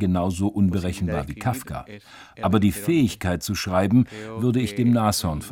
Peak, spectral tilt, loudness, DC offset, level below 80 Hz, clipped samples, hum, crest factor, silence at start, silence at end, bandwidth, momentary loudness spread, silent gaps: -6 dBFS; -6 dB/octave; -23 LUFS; under 0.1%; -46 dBFS; under 0.1%; none; 16 dB; 0 s; 0 s; 17.5 kHz; 8 LU; none